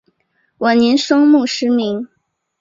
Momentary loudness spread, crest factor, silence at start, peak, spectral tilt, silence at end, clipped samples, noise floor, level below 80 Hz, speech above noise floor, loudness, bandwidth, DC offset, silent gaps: 12 LU; 14 dB; 0.6 s; -2 dBFS; -4 dB/octave; 0.55 s; under 0.1%; -63 dBFS; -62 dBFS; 50 dB; -14 LUFS; 7.8 kHz; under 0.1%; none